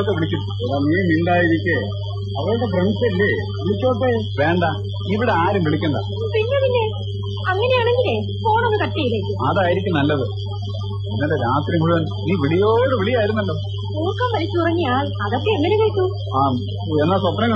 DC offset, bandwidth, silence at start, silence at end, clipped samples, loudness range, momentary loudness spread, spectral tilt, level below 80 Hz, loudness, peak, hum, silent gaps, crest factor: under 0.1%; 6.2 kHz; 0 s; 0 s; under 0.1%; 1 LU; 7 LU; -8.5 dB/octave; -46 dBFS; -19 LUFS; -4 dBFS; none; none; 14 dB